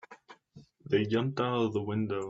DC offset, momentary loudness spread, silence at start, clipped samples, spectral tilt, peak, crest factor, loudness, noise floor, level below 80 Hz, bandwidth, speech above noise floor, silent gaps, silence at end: under 0.1%; 4 LU; 0.1 s; under 0.1%; -7.5 dB/octave; -14 dBFS; 18 dB; -31 LUFS; -57 dBFS; -70 dBFS; 8 kHz; 28 dB; none; 0 s